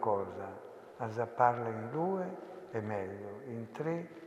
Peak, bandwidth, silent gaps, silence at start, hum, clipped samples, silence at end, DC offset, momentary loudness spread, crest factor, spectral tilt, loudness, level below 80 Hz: -12 dBFS; 13 kHz; none; 0 s; none; under 0.1%; 0 s; under 0.1%; 15 LU; 24 dB; -8.5 dB/octave; -37 LUFS; -82 dBFS